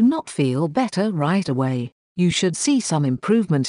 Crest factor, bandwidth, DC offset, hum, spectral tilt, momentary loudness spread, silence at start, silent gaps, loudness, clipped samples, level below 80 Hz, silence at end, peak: 14 dB; 11 kHz; under 0.1%; none; -5.5 dB/octave; 3 LU; 0 s; 1.92-2.15 s; -21 LUFS; under 0.1%; -58 dBFS; 0 s; -6 dBFS